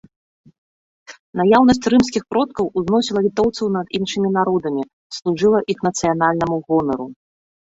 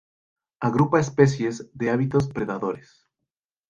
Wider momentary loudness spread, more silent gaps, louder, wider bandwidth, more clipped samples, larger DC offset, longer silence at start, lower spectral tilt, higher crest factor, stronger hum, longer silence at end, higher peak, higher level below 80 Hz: about the same, 11 LU vs 9 LU; first, 1.19-1.33 s, 4.93-5.10 s vs none; first, -18 LUFS vs -23 LUFS; second, 8 kHz vs 9 kHz; neither; neither; first, 1.1 s vs 0.6 s; second, -5.5 dB/octave vs -7.5 dB/octave; about the same, 18 dB vs 22 dB; neither; second, 0.65 s vs 0.9 s; about the same, -2 dBFS vs -2 dBFS; about the same, -50 dBFS vs -54 dBFS